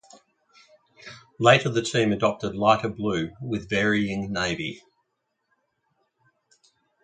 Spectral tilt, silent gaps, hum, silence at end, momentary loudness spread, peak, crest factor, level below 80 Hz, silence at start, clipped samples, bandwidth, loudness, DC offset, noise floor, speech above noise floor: -5 dB/octave; none; none; 2.25 s; 17 LU; -2 dBFS; 24 dB; -56 dBFS; 1.05 s; under 0.1%; 9.4 kHz; -24 LUFS; under 0.1%; -77 dBFS; 54 dB